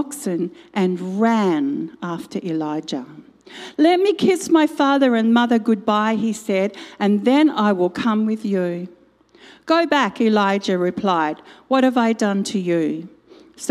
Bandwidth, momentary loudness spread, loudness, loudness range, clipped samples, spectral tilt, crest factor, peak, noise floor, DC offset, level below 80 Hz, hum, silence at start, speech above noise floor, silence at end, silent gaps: 14 kHz; 11 LU; -19 LUFS; 4 LU; under 0.1%; -5.5 dB/octave; 16 dB; -2 dBFS; -40 dBFS; under 0.1%; -68 dBFS; none; 0 s; 21 dB; 0 s; none